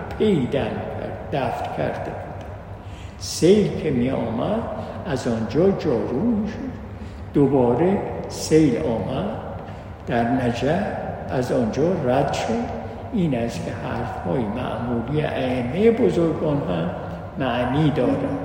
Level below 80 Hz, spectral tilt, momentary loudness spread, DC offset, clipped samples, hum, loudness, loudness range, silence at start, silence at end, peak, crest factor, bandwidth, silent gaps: -42 dBFS; -6.5 dB/octave; 14 LU; under 0.1%; under 0.1%; none; -22 LUFS; 3 LU; 0 s; 0 s; -4 dBFS; 18 dB; 16 kHz; none